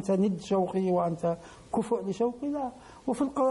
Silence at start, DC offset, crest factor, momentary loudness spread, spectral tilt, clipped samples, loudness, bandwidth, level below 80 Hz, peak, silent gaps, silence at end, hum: 0 s; under 0.1%; 12 dB; 8 LU; -7.5 dB/octave; under 0.1%; -30 LUFS; 11.5 kHz; -60 dBFS; -16 dBFS; none; 0 s; none